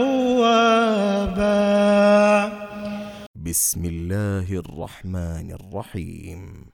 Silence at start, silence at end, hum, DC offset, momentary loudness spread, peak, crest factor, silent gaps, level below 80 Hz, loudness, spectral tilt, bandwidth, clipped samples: 0 s; 0.15 s; none; under 0.1%; 18 LU; -4 dBFS; 16 dB; 3.26-3.34 s; -42 dBFS; -19 LUFS; -4.5 dB/octave; 19 kHz; under 0.1%